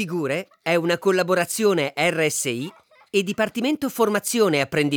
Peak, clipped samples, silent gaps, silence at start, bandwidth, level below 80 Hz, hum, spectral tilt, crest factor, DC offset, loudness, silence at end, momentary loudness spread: -8 dBFS; under 0.1%; none; 0 s; over 20 kHz; -68 dBFS; none; -4 dB/octave; 14 dB; under 0.1%; -22 LUFS; 0 s; 6 LU